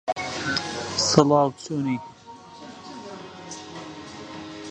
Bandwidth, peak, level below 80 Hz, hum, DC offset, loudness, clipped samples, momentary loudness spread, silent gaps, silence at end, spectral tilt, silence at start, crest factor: 10.5 kHz; 0 dBFS; -58 dBFS; none; under 0.1%; -23 LUFS; under 0.1%; 23 LU; none; 0 s; -4 dB/octave; 0.05 s; 26 dB